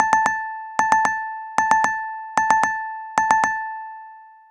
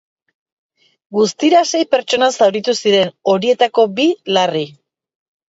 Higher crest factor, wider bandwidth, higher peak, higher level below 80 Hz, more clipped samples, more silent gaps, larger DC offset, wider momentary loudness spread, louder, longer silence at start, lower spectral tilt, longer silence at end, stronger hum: about the same, 20 dB vs 16 dB; first, 16.5 kHz vs 8 kHz; about the same, 0 dBFS vs 0 dBFS; first, -60 dBFS vs -66 dBFS; neither; neither; neither; first, 10 LU vs 5 LU; second, -21 LUFS vs -15 LUFS; second, 0 s vs 1.1 s; second, -2 dB/octave vs -3.5 dB/octave; second, 0.2 s vs 0.8 s; neither